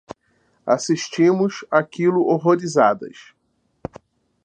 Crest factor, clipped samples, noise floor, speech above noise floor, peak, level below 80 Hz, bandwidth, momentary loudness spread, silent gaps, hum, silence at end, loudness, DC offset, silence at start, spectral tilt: 20 dB; under 0.1%; -63 dBFS; 45 dB; -2 dBFS; -62 dBFS; 9.2 kHz; 20 LU; none; none; 1.35 s; -19 LUFS; under 0.1%; 0.1 s; -5.5 dB/octave